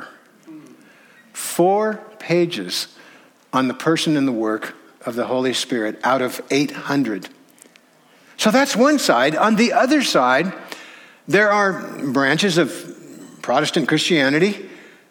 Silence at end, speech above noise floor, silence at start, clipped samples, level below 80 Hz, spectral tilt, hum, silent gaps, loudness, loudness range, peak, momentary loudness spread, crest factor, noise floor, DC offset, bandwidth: 0.3 s; 35 dB; 0 s; under 0.1%; -70 dBFS; -4 dB/octave; none; none; -18 LUFS; 5 LU; -2 dBFS; 16 LU; 18 dB; -53 dBFS; under 0.1%; over 20 kHz